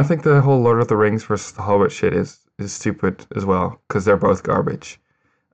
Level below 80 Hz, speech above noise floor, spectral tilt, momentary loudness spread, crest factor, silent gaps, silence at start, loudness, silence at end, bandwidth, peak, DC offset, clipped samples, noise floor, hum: -52 dBFS; 48 dB; -7 dB/octave; 12 LU; 12 dB; none; 0 s; -18 LUFS; 0.6 s; 8.8 kHz; -6 dBFS; under 0.1%; under 0.1%; -66 dBFS; none